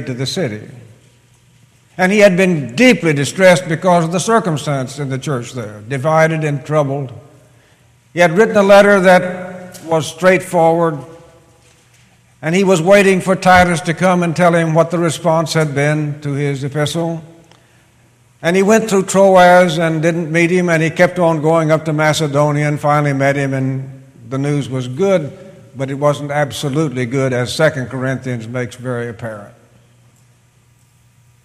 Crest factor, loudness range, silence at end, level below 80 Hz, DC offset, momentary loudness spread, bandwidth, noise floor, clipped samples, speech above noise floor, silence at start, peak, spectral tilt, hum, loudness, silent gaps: 14 dB; 7 LU; 1.95 s; -50 dBFS; under 0.1%; 14 LU; 15.5 kHz; -52 dBFS; under 0.1%; 38 dB; 0 s; 0 dBFS; -5.5 dB/octave; none; -14 LUFS; none